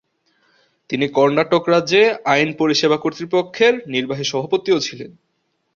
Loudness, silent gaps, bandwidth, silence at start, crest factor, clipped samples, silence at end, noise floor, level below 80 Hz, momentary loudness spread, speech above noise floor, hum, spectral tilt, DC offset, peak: -17 LUFS; none; 7.4 kHz; 0.9 s; 16 dB; under 0.1%; 0.65 s; -63 dBFS; -62 dBFS; 8 LU; 45 dB; none; -4.5 dB/octave; under 0.1%; -2 dBFS